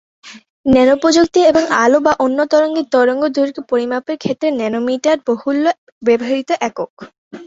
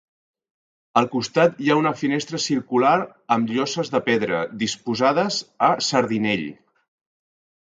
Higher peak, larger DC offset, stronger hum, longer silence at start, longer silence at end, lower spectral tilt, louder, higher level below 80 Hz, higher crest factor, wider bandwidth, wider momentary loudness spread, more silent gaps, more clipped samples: first, 0 dBFS vs -4 dBFS; neither; neither; second, 0.25 s vs 0.95 s; second, 0 s vs 1.2 s; about the same, -4.5 dB/octave vs -4.5 dB/octave; first, -15 LUFS vs -21 LUFS; first, -50 dBFS vs -64 dBFS; second, 14 dB vs 20 dB; second, 8 kHz vs 9.4 kHz; first, 9 LU vs 6 LU; first, 0.50-0.64 s, 5.78-6.01 s, 6.90-6.97 s, 7.18-7.31 s vs none; neither